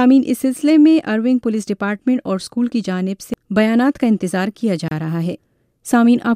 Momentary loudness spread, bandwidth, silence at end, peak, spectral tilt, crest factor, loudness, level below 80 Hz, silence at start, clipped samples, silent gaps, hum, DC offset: 10 LU; 15.5 kHz; 0 s; -4 dBFS; -6.5 dB/octave; 14 dB; -17 LUFS; -56 dBFS; 0 s; under 0.1%; none; none; under 0.1%